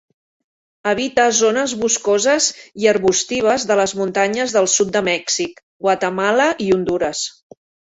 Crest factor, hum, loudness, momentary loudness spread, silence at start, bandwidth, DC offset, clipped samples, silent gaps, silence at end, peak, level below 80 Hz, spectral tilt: 16 dB; none; -17 LUFS; 6 LU; 0.85 s; 8.2 kHz; under 0.1%; under 0.1%; 5.63-5.80 s; 0.6 s; -2 dBFS; -56 dBFS; -2.5 dB/octave